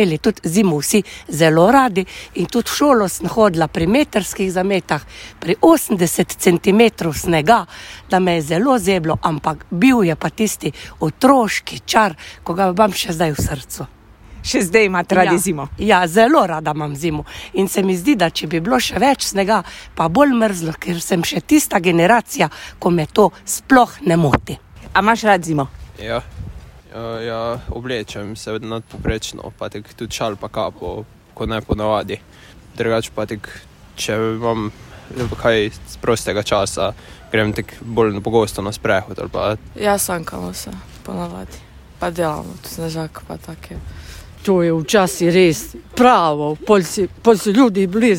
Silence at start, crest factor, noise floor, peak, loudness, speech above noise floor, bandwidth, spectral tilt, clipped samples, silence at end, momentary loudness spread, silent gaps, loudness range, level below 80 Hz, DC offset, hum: 0 s; 18 dB; -37 dBFS; 0 dBFS; -17 LUFS; 20 dB; 16.5 kHz; -5 dB/octave; under 0.1%; 0 s; 16 LU; none; 10 LU; -40 dBFS; under 0.1%; none